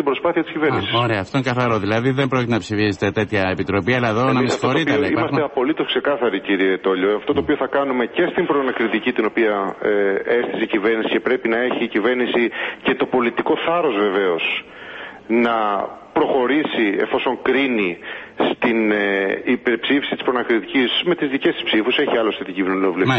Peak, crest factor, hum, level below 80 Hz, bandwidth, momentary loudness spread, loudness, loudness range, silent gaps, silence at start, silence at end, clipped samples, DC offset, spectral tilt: -4 dBFS; 14 dB; none; -52 dBFS; 8.4 kHz; 4 LU; -19 LUFS; 1 LU; none; 0 s; 0 s; under 0.1%; under 0.1%; -6 dB/octave